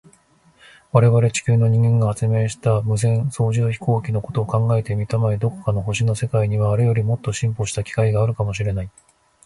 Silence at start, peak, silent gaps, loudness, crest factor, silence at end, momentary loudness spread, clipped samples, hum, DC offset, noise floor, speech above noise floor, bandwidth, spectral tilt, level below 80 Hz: 0.95 s; 0 dBFS; none; -20 LUFS; 18 dB; 0.55 s; 7 LU; under 0.1%; none; under 0.1%; -55 dBFS; 37 dB; 11.5 kHz; -6.5 dB/octave; -44 dBFS